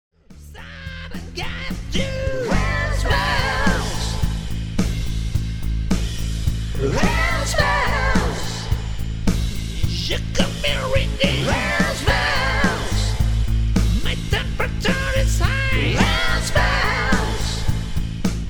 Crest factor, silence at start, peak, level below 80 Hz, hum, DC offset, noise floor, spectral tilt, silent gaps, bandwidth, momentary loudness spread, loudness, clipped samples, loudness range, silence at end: 18 dB; 0.3 s; -2 dBFS; -24 dBFS; none; under 0.1%; -40 dBFS; -4.5 dB/octave; none; 19.5 kHz; 8 LU; -21 LUFS; under 0.1%; 3 LU; 0 s